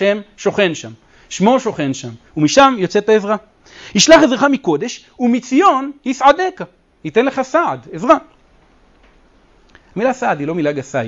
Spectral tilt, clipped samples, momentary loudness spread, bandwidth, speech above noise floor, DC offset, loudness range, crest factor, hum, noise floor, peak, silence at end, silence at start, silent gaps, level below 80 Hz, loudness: -4 dB/octave; under 0.1%; 16 LU; 8.6 kHz; 36 dB; under 0.1%; 6 LU; 16 dB; none; -50 dBFS; 0 dBFS; 0 s; 0 s; none; -50 dBFS; -15 LUFS